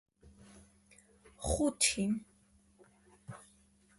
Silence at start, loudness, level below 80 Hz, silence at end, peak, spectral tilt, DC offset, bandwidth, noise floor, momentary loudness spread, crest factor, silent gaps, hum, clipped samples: 0.25 s; -33 LUFS; -52 dBFS; 0.6 s; -14 dBFS; -3 dB/octave; under 0.1%; 12 kHz; -67 dBFS; 24 LU; 24 dB; none; none; under 0.1%